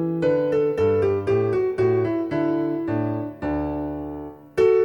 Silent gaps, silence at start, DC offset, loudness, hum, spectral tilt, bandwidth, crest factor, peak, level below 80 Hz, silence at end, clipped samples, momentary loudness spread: none; 0 s; under 0.1%; -23 LUFS; none; -9 dB/octave; 7 kHz; 14 dB; -8 dBFS; -46 dBFS; 0 s; under 0.1%; 9 LU